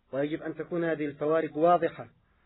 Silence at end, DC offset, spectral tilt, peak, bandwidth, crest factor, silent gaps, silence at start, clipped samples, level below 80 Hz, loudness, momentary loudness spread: 0.35 s; under 0.1%; -5.5 dB/octave; -12 dBFS; 4 kHz; 16 dB; none; 0.15 s; under 0.1%; -68 dBFS; -29 LUFS; 11 LU